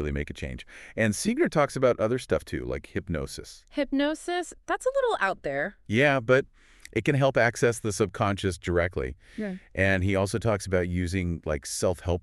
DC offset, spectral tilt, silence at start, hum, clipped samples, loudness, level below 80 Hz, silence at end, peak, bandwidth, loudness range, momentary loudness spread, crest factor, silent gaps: under 0.1%; -5.5 dB/octave; 0 s; none; under 0.1%; -27 LUFS; -46 dBFS; 0 s; -8 dBFS; 13.5 kHz; 4 LU; 12 LU; 20 dB; none